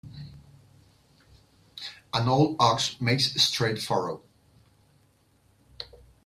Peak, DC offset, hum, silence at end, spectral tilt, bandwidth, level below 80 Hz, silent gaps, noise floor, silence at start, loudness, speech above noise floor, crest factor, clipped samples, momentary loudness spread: -6 dBFS; under 0.1%; none; 0.4 s; -4 dB/octave; 15 kHz; -60 dBFS; none; -64 dBFS; 0.05 s; -24 LUFS; 39 dB; 24 dB; under 0.1%; 22 LU